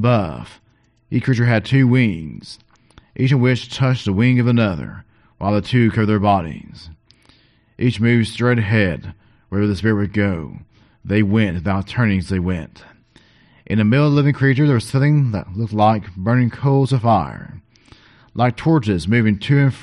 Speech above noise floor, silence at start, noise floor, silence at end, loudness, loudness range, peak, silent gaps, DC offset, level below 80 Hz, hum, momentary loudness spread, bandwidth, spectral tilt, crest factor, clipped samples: 37 dB; 0 s; -54 dBFS; 0 s; -17 LUFS; 4 LU; -2 dBFS; none; under 0.1%; -44 dBFS; none; 15 LU; 11 kHz; -8 dB/octave; 16 dB; under 0.1%